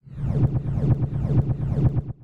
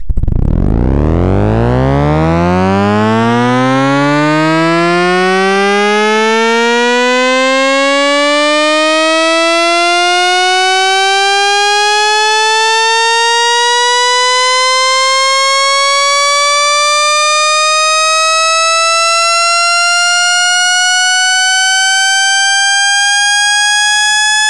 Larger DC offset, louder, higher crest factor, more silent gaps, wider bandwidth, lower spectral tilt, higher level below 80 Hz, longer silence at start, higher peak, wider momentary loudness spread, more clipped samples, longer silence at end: second, under 0.1% vs 1%; second, -23 LUFS vs -9 LUFS; about the same, 14 dB vs 10 dB; neither; second, 3.8 kHz vs 12 kHz; first, -11.5 dB/octave vs -2.5 dB/octave; second, -32 dBFS vs -26 dBFS; about the same, 0.05 s vs 0 s; second, -10 dBFS vs 0 dBFS; about the same, 2 LU vs 3 LU; second, under 0.1% vs 0.7%; about the same, 0 s vs 0 s